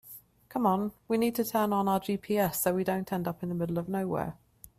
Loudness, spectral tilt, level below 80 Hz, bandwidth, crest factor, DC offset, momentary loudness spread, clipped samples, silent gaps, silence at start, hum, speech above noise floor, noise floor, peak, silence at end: -30 LUFS; -6 dB/octave; -62 dBFS; 16 kHz; 16 dB; under 0.1%; 7 LU; under 0.1%; none; 0.05 s; none; 23 dB; -52 dBFS; -14 dBFS; 0.45 s